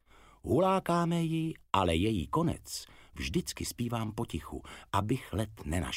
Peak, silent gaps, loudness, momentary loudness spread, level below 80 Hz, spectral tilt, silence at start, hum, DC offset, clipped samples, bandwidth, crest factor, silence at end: -10 dBFS; none; -32 LUFS; 13 LU; -50 dBFS; -5.5 dB/octave; 0.45 s; none; under 0.1%; under 0.1%; 16 kHz; 22 dB; 0 s